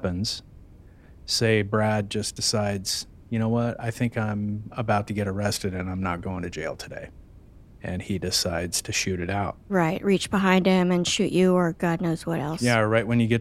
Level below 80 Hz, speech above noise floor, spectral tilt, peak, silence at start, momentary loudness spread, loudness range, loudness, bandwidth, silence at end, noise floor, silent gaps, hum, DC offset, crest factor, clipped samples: -50 dBFS; 24 dB; -5 dB/octave; -4 dBFS; 0 s; 11 LU; 7 LU; -25 LUFS; 15.5 kHz; 0 s; -49 dBFS; none; none; under 0.1%; 20 dB; under 0.1%